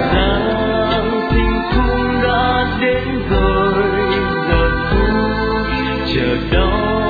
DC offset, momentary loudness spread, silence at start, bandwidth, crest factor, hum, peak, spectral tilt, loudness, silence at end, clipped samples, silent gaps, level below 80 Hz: under 0.1%; 3 LU; 0 s; 4.9 kHz; 14 dB; none; -2 dBFS; -8.5 dB/octave; -16 LUFS; 0 s; under 0.1%; none; -22 dBFS